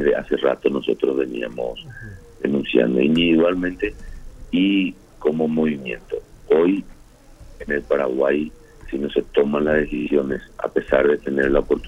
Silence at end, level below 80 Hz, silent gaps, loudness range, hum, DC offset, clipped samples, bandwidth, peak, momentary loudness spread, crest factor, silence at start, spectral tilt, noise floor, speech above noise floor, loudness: 0 s; -40 dBFS; none; 3 LU; none; under 0.1%; under 0.1%; 11.5 kHz; -2 dBFS; 12 LU; 20 dB; 0 s; -7 dB/octave; -45 dBFS; 25 dB; -21 LUFS